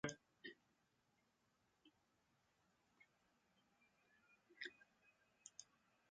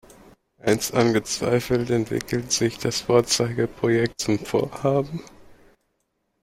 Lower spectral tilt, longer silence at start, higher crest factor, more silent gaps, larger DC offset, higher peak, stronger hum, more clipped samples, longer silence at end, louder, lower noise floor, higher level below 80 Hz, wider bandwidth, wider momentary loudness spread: second, -3 dB/octave vs -4.5 dB/octave; second, 0.05 s vs 0.65 s; first, 30 dB vs 20 dB; neither; neither; second, -32 dBFS vs -4 dBFS; neither; neither; second, 0.45 s vs 0.9 s; second, -58 LUFS vs -23 LUFS; first, -84 dBFS vs -73 dBFS; second, -88 dBFS vs -52 dBFS; second, 7.4 kHz vs 16.5 kHz; about the same, 8 LU vs 6 LU